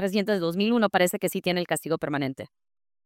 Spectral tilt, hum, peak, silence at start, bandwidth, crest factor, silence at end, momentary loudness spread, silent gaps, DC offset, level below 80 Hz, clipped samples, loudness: -5 dB/octave; none; -8 dBFS; 0 s; 17 kHz; 18 dB; 0.6 s; 9 LU; none; under 0.1%; -70 dBFS; under 0.1%; -25 LUFS